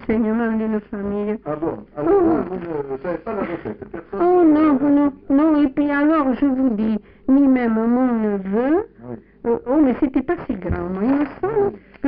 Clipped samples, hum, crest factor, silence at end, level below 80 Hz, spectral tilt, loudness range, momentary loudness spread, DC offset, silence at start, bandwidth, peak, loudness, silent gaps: under 0.1%; none; 12 dB; 0 s; -44 dBFS; -7.5 dB/octave; 5 LU; 11 LU; under 0.1%; 0 s; 4.7 kHz; -6 dBFS; -19 LUFS; none